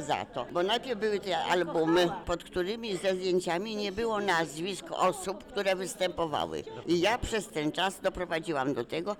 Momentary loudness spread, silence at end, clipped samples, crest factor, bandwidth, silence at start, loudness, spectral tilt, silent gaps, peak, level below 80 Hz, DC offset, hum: 7 LU; 0 s; under 0.1%; 12 dB; 19 kHz; 0 s; -31 LUFS; -4 dB/octave; none; -18 dBFS; -54 dBFS; under 0.1%; none